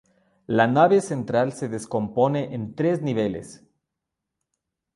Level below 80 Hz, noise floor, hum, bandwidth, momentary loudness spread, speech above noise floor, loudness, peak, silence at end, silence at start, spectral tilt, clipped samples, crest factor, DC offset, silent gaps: -60 dBFS; -84 dBFS; none; 11.5 kHz; 10 LU; 61 dB; -23 LUFS; -4 dBFS; 1.4 s; 0.5 s; -6.5 dB/octave; under 0.1%; 20 dB; under 0.1%; none